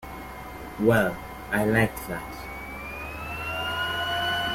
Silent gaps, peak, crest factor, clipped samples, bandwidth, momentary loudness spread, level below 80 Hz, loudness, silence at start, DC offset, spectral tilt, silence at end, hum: none; -8 dBFS; 20 dB; under 0.1%; 16.5 kHz; 16 LU; -46 dBFS; -27 LUFS; 0 s; under 0.1%; -5 dB/octave; 0 s; none